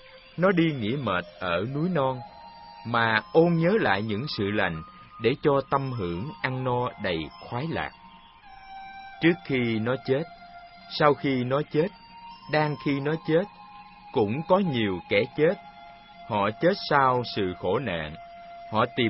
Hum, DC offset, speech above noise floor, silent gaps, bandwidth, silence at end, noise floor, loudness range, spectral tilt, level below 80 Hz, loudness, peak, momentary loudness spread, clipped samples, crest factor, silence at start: none; under 0.1%; 25 dB; none; 5.8 kHz; 0 s; -50 dBFS; 4 LU; -10.5 dB/octave; -56 dBFS; -26 LUFS; -4 dBFS; 21 LU; under 0.1%; 22 dB; 0.15 s